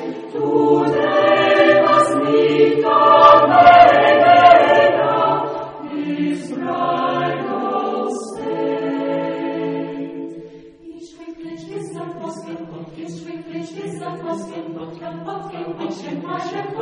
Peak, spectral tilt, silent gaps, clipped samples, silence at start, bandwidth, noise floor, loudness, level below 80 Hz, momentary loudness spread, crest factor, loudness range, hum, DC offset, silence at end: 0 dBFS; -5.5 dB/octave; none; under 0.1%; 0 s; 10 kHz; -39 dBFS; -14 LUFS; -56 dBFS; 22 LU; 16 dB; 20 LU; none; under 0.1%; 0 s